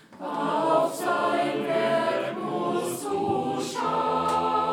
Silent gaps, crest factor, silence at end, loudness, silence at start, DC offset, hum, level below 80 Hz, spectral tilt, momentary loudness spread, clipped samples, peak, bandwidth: none; 16 dB; 0 s; -26 LUFS; 0.1 s; under 0.1%; none; -68 dBFS; -4.5 dB/octave; 5 LU; under 0.1%; -10 dBFS; 18.5 kHz